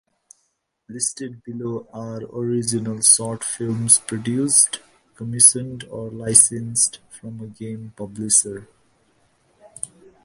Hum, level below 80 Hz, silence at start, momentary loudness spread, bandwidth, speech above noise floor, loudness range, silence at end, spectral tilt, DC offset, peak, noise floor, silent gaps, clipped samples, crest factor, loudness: none; -60 dBFS; 0.9 s; 21 LU; 12 kHz; 50 dB; 7 LU; 0.4 s; -3 dB/octave; under 0.1%; 0 dBFS; -71 dBFS; none; under 0.1%; 22 dB; -17 LUFS